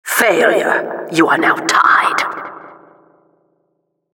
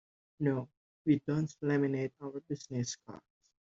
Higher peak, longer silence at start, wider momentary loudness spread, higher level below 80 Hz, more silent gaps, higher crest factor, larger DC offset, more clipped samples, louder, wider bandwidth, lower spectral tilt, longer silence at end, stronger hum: first, 0 dBFS vs -16 dBFS; second, 0.05 s vs 0.4 s; second, 10 LU vs 14 LU; about the same, -72 dBFS vs -72 dBFS; second, none vs 0.77-1.05 s; about the same, 16 dB vs 20 dB; neither; neither; first, -13 LUFS vs -35 LUFS; first, 18 kHz vs 7.8 kHz; second, -3 dB/octave vs -7.5 dB/octave; first, 1.4 s vs 0.45 s; neither